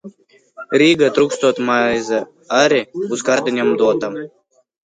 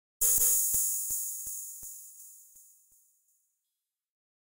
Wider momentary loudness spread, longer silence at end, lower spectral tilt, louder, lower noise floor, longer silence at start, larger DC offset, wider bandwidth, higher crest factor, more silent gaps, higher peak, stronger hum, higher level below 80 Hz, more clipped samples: second, 9 LU vs 22 LU; second, 0.55 s vs 1.95 s; first, -4 dB/octave vs 1 dB/octave; first, -16 LUFS vs -26 LUFS; second, -47 dBFS vs -87 dBFS; second, 0.05 s vs 0.2 s; neither; second, 9.4 kHz vs 16.5 kHz; about the same, 16 dB vs 20 dB; neither; first, 0 dBFS vs -14 dBFS; neither; about the same, -60 dBFS vs -60 dBFS; neither